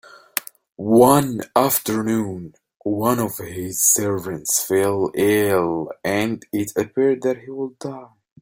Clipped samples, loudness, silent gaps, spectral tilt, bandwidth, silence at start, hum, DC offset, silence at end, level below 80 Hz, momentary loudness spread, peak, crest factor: under 0.1%; -20 LUFS; 2.76-2.80 s; -4.5 dB/octave; 17 kHz; 0.35 s; none; under 0.1%; 0.35 s; -56 dBFS; 14 LU; 0 dBFS; 20 dB